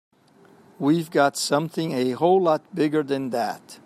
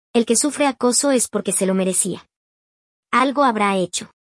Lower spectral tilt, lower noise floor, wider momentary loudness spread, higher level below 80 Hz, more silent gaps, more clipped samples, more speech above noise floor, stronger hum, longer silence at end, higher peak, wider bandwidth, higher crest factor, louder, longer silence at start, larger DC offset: first, -5 dB/octave vs -3.5 dB/octave; second, -54 dBFS vs under -90 dBFS; about the same, 7 LU vs 6 LU; second, -72 dBFS vs -66 dBFS; second, none vs 2.36-3.03 s; neither; second, 32 dB vs over 71 dB; neither; about the same, 0.1 s vs 0.15 s; about the same, -6 dBFS vs -4 dBFS; first, 15.5 kHz vs 12 kHz; about the same, 16 dB vs 16 dB; second, -23 LUFS vs -18 LUFS; first, 0.8 s vs 0.15 s; neither